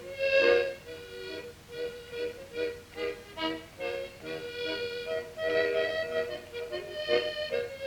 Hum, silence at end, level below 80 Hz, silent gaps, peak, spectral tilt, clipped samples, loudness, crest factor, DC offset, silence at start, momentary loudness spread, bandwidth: none; 0 s; -62 dBFS; none; -12 dBFS; -3.5 dB/octave; under 0.1%; -32 LUFS; 20 dB; under 0.1%; 0 s; 13 LU; 19 kHz